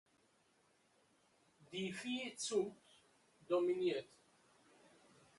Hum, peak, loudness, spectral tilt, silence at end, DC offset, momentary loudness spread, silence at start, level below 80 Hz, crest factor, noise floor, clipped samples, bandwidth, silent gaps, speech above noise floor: none; -26 dBFS; -41 LUFS; -4 dB/octave; 1.35 s; under 0.1%; 9 LU; 1.6 s; -88 dBFS; 20 dB; -75 dBFS; under 0.1%; 11.5 kHz; none; 36 dB